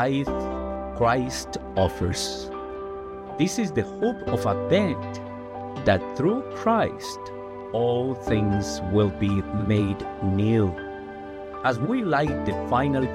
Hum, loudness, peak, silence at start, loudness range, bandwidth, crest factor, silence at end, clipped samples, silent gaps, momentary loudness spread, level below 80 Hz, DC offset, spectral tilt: none; -25 LUFS; -8 dBFS; 0 s; 2 LU; 15 kHz; 18 dB; 0 s; under 0.1%; none; 13 LU; -46 dBFS; under 0.1%; -6 dB/octave